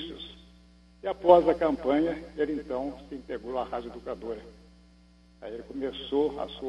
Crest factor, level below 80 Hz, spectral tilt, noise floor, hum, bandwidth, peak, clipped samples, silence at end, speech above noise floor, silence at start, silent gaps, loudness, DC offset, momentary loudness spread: 24 dB; -54 dBFS; -7 dB/octave; -57 dBFS; 60 Hz at -50 dBFS; 8 kHz; -4 dBFS; under 0.1%; 0 s; 29 dB; 0 s; none; -28 LUFS; under 0.1%; 21 LU